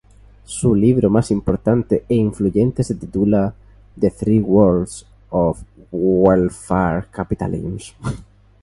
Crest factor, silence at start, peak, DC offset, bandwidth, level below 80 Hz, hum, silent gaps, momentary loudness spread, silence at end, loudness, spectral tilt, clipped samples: 18 dB; 0.5 s; 0 dBFS; under 0.1%; 11.5 kHz; -38 dBFS; none; none; 14 LU; 0.4 s; -18 LUFS; -8 dB/octave; under 0.1%